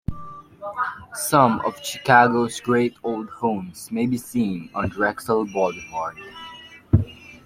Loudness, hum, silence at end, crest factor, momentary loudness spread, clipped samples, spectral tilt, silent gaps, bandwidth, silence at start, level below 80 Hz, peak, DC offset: -22 LUFS; none; 0.1 s; 20 dB; 19 LU; under 0.1%; -5.5 dB/octave; none; 16.5 kHz; 0.1 s; -46 dBFS; -2 dBFS; under 0.1%